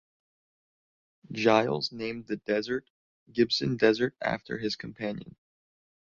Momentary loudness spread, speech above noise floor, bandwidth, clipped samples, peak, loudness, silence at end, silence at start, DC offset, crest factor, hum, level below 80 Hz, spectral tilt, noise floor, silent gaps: 12 LU; over 62 dB; 7.4 kHz; under 0.1%; -8 dBFS; -29 LUFS; 0.75 s; 1.3 s; under 0.1%; 22 dB; none; -64 dBFS; -5.5 dB/octave; under -90 dBFS; 2.90-3.26 s